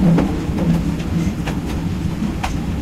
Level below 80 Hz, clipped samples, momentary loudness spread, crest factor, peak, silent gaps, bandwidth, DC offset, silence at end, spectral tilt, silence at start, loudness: -28 dBFS; under 0.1%; 5 LU; 12 dB; -6 dBFS; none; 14.5 kHz; under 0.1%; 0 s; -7.5 dB/octave; 0 s; -20 LUFS